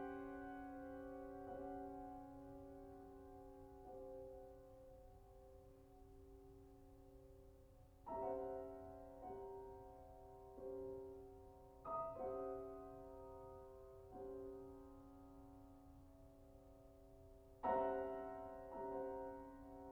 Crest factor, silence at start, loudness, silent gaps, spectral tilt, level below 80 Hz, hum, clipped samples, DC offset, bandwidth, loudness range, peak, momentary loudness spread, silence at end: 24 dB; 0 s; -52 LUFS; none; -8 dB/octave; -68 dBFS; none; under 0.1%; under 0.1%; over 20 kHz; 12 LU; -30 dBFS; 18 LU; 0 s